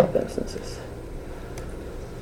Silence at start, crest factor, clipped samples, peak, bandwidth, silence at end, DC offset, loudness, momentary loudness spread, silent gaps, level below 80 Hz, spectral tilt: 0 s; 26 dB; under 0.1%; -4 dBFS; 18.5 kHz; 0 s; under 0.1%; -32 LUFS; 12 LU; none; -38 dBFS; -6 dB/octave